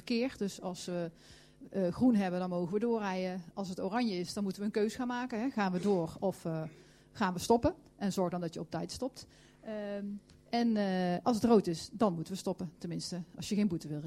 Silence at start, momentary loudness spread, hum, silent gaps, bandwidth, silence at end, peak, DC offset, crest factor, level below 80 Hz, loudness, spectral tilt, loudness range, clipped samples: 0.05 s; 12 LU; none; none; 15.5 kHz; 0 s; -14 dBFS; under 0.1%; 20 dB; -62 dBFS; -34 LUFS; -6 dB/octave; 3 LU; under 0.1%